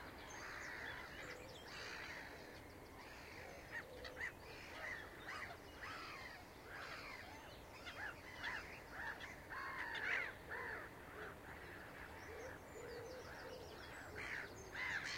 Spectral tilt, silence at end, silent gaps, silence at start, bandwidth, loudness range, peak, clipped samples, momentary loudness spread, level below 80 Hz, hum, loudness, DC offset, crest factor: -3 dB/octave; 0 s; none; 0 s; 16 kHz; 5 LU; -30 dBFS; under 0.1%; 8 LU; -66 dBFS; none; -50 LUFS; under 0.1%; 22 dB